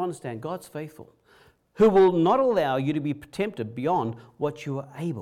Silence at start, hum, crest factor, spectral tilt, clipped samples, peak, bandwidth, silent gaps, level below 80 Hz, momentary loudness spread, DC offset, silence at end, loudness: 0 s; none; 14 dB; -7.5 dB/octave; under 0.1%; -10 dBFS; 14 kHz; none; -58 dBFS; 16 LU; under 0.1%; 0 s; -25 LUFS